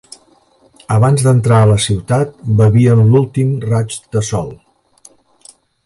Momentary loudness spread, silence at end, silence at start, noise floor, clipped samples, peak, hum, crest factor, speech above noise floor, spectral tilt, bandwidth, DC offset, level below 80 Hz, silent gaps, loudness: 10 LU; 1.3 s; 0.9 s; -51 dBFS; under 0.1%; 0 dBFS; none; 14 dB; 40 dB; -6.5 dB/octave; 11.5 kHz; under 0.1%; -40 dBFS; none; -13 LUFS